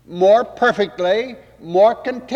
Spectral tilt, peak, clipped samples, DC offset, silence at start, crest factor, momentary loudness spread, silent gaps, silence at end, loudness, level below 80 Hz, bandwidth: -5.5 dB/octave; -4 dBFS; under 0.1%; under 0.1%; 0.1 s; 14 dB; 8 LU; none; 0 s; -16 LUFS; -56 dBFS; 7.8 kHz